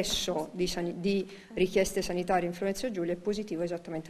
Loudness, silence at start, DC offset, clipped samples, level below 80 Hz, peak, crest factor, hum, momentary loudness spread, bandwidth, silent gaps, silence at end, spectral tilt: -31 LUFS; 0 s; under 0.1%; under 0.1%; -52 dBFS; -14 dBFS; 18 dB; none; 5 LU; 13.5 kHz; none; 0 s; -4.5 dB/octave